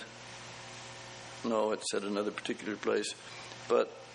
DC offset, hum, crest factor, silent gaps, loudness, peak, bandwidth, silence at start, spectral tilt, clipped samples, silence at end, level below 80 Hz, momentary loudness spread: under 0.1%; none; 20 dB; none; -35 LUFS; -16 dBFS; 10.5 kHz; 0 s; -3.5 dB/octave; under 0.1%; 0 s; -74 dBFS; 14 LU